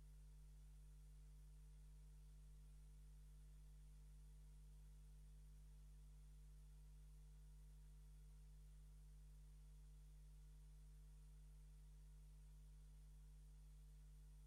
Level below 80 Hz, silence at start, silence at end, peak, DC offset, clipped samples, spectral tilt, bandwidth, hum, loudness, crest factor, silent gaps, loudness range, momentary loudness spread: -64 dBFS; 0 s; 0 s; -58 dBFS; under 0.1%; under 0.1%; -5.5 dB/octave; 12.5 kHz; 50 Hz at -65 dBFS; -67 LUFS; 6 dB; none; 0 LU; 0 LU